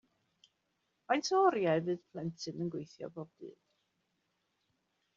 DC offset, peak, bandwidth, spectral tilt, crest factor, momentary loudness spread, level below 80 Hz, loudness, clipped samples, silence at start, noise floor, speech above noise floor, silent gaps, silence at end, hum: under 0.1%; -14 dBFS; 7.4 kHz; -4.5 dB/octave; 22 dB; 20 LU; -82 dBFS; -34 LUFS; under 0.1%; 1.1 s; -81 dBFS; 47 dB; none; 1.65 s; none